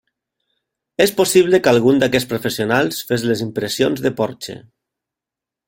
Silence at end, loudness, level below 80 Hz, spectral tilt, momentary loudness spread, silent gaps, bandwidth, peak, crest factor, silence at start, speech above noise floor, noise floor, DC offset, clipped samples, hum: 1.05 s; -17 LUFS; -54 dBFS; -4.5 dB/octave; 11 LU; none; 17 kHz; -2 dBFS; 18 dB; 1 s; 70 dB; -86 dBFS; under 0.1%; under 0.1%; none